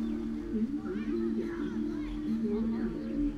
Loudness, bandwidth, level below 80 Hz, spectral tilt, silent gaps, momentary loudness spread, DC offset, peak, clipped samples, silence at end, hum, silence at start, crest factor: -34 LUFS; 7.2 kHz; -46 dBFS; -8 dB/octave; none; 3 LU; under 0.1%; -22 dBFS; under 0.1%; 0 s; none; 0 s; 10 dB